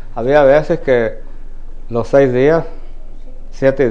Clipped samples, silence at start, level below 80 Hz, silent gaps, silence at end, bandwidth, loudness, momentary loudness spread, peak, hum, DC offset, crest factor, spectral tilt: under 0.1%; 0 s; -26 dBFS; none; 0 s; 7.4 kHz; -13 LUFS; 12 LU; 0 dBFS; none; 2%; 14 dB; -7.5 dB/octave